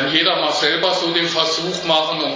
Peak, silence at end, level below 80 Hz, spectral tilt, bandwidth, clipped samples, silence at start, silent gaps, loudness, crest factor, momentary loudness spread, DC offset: -2 dBFS; 0 s; -62 dBFS; -3 dB/octave; 7.6 kHz; under 0.1%; 0 s; none; -17 LUFS; 16 dB; 3 LU; under 0.1%